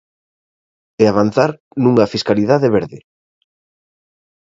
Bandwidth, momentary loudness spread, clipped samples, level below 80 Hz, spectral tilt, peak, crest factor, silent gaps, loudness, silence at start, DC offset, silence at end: 7.8 kHz; 5 LU; under 0.1%; -52 dBFS; -7 dB/octave; 0 dBFS; 18 dB; 1.60-1.71 s; -15 LUFS; 1 s; under 0.1%; 1.55 s